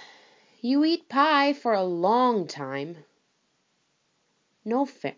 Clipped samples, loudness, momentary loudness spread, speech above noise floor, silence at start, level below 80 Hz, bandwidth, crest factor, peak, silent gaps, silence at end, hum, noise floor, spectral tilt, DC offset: under 0.1%; -24 LUFS; 13 LU; 47 dB; 0 s; under -90 dBFS; 7.6 kHz; 20 dB; -8 dBFS; none; 0.05 s; none; -71 dBFS; -5.5 dB/octave; under 0.1%